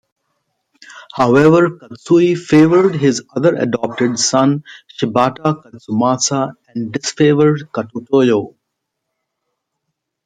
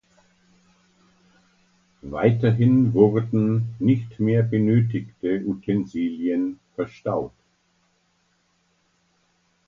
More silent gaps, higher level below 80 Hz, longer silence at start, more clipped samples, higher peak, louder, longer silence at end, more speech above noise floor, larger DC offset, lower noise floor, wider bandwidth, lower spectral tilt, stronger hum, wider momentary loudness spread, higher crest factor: neither; about the same, -56 dBFS vs -56 dBFS; second, 0.95 s vs 2.05 s; neither; about the same, -2 dBFS vs -2 dBFS; first, -14 LUFS vs -22 LUFS; second, 1.75 s vs 2.4 s; first, 61 dB vs 46 dB; neither; first, -75 dBFS vs -67 dBFS; first, 9.4 kHz vs 6.4 kHz; second, -5.5 dB/octave vs -10 dB/octave; neither; about the same, 13 LU vs 11 LU; second, 14 dB vs 20 dB